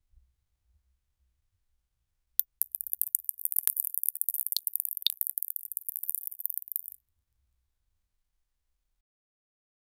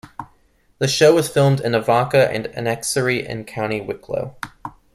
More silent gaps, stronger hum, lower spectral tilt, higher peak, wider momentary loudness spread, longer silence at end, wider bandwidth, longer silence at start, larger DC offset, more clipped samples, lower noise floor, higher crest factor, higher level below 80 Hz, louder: neither; neither; second, 4.5 dB/octave vs -5 dB/octave; about the same, 0 dBFS vs -2 dBFS; second, 6 LU vs 18 LU; first, 3.2 s vs 0.25 s; first, over 20 kHz vs 15.5 kHz; first, 2.4 s vs 0.05 s; neither; neither; first, -79 dBFS vs -57 dBFS; first, 36 dB vs 18 dB; second, -76 dBFS vs -52 dBFS; second, -30 LUFS vs -19 LUFS